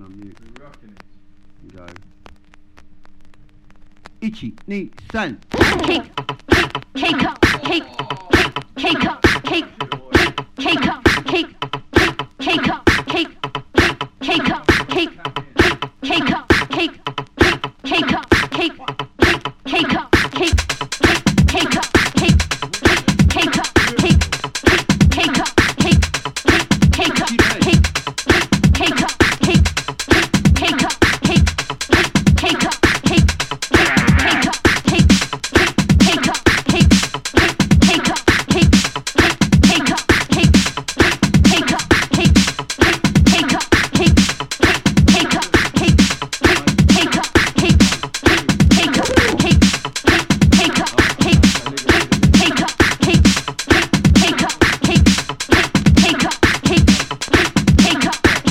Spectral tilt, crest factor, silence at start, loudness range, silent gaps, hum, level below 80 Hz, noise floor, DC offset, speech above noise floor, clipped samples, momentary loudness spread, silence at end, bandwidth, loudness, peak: -4.5 dB/octave; 16 dB; 0 s; 4 LU; none; none; -26 dBFS; -43 dBFS; under 0.1%; 21 dB; under 0.1%; 8 LU; 0 s; 16.5 kHz; -14 LUFS; 0 dBFS